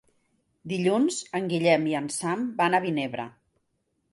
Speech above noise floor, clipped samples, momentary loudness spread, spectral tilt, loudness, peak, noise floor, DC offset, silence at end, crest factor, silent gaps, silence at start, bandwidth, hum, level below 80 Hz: 49 dB; under 0.1%; 11 LU; -5 dB/octave; -26 LUFS; -8 dBFS; -75 dBFS; under 0.1%; 0.8 s; 20 dB; none; 0.65 s; 11.5 kHz; none; -70 dBFS